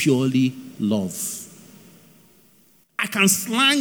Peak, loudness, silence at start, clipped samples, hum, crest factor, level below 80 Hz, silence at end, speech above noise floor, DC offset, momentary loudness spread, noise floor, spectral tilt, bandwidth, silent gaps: -4 dBFS; -21 LUFS; 0 s; under 0.1%; none; 18 dB; -72 dBFS; 0 s; 36 dB; under 0.1%; 14 LU; -57 dBFS; -3.5 dB/octave; over 20 kHz; none